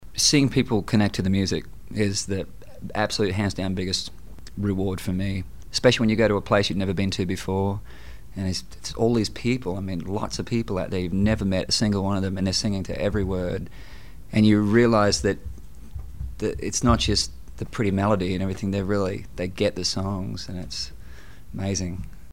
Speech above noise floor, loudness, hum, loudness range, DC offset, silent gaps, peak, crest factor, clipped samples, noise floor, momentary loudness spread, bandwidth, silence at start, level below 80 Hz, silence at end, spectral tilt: 20 dB; -24 LUFS; none; 4 LU; 1%; none; -6 dBFS; 18 dB; under 0.1%; -44 dBFS; 15 LU; 16 kHz; 0 s; -40 dBFS; 0 s; -5 dB/octave